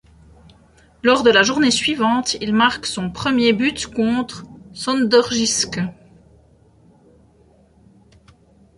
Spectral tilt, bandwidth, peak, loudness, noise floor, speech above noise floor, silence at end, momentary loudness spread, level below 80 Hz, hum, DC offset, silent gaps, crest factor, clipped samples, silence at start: -3 dB/octave; 11.5 kHz; -2 dBFS; -17 LUFS; -53 dBFS; 36 dB; 2.85 s; 12 LU; -50 dBFS; none; under 0.1%; none; 18 dB; under 0.1%; 1.05 s